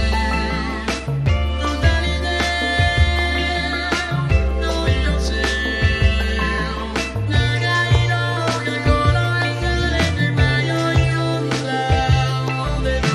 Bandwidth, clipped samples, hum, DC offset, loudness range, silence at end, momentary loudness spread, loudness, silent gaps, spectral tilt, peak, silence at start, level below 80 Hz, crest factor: 12.5 kHz; under 0.1%; none; under 0.1%; 1 LU; 0 s; 5 LU; -19 LUFS; none; -5.5 dB/octave; -4 dBFS; 0 s; -24 dBFS; 14 dB